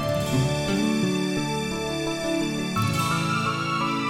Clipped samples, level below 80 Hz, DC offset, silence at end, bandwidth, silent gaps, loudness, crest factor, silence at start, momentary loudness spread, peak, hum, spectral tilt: under 0.1%; -46 dBFS; under 0.1%; 0 s; 17 kHz; none; -25 LUFS; 12 dB; 0 s; 4 LU; -12 dBFS; none; -5 dB/octave